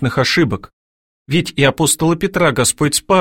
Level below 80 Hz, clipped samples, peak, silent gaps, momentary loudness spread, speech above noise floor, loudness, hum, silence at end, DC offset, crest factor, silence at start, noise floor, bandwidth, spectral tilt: -42 dBFS; under 0.1%; -2 dBFS; 0.73-1.26 s; 5 LU; over 75 dB; -15 LUFS; none; 0 s; under 0.1%; 14 dB; 0 s; under -90 dBFS; 16.5 kHz; -4 dB/octave